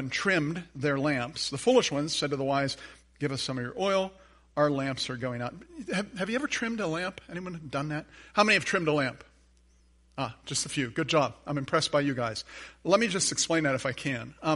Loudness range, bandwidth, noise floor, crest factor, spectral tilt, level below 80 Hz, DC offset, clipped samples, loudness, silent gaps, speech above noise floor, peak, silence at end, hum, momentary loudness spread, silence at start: 4 LU; 11.5 kHz; -62 dBFS; 22 dB; -4 dB/octave; -60 dBFS; under 0.1%; under 0.1%; -29 LUFS; none; 33 dB; -8 dBFS; 0 s; none; 13 LU; 0 s